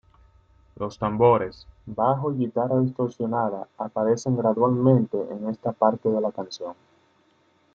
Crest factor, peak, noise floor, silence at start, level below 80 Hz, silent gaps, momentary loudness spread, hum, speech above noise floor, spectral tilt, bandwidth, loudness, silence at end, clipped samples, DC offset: 20 dB; -4 dBFS; -63 dBFS; 0.8 s; -58 dBFS; none; 15 LU; none; 40 dB; -8 dB/octave; 7.4 kHz; -24 LUFS; 1 s; under 0.1%; under 0.1%